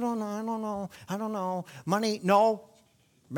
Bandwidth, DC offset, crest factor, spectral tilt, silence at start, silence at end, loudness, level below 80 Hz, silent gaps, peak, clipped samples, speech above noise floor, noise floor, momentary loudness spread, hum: 18.5 kHz; under 0.1%; 20 dB; -5.5 dB/octave; 0 s; 0 s; -29 LUFS; -72 dBFS; none; -10 dBFS; under 0.1%; 36 dB; -65 dBFS; 13 LU; none